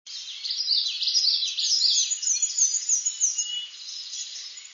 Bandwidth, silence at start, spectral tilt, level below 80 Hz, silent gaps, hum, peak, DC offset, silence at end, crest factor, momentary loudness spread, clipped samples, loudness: 7.6 kHz; 0.05 s; 8 dB/octave; under -90 dBFS; none; none; -10 dBFS; under 0.1%; 0 s; 16 dB; 14 LU; under 0.1%; -22 LUFS